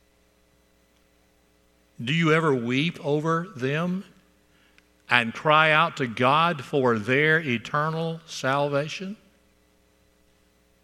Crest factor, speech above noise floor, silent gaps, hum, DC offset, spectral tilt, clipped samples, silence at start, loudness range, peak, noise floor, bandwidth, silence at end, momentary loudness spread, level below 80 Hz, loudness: 26 dB; 39 dB; none; none; under 0.1%; -5.5 dB/octave; under 0.1%; 2 s; 5 LU; 0 dBFS; -63 dBFS; 13 kHz; 1.7 s; 11 LU; -68 dBFS; -23 LUFS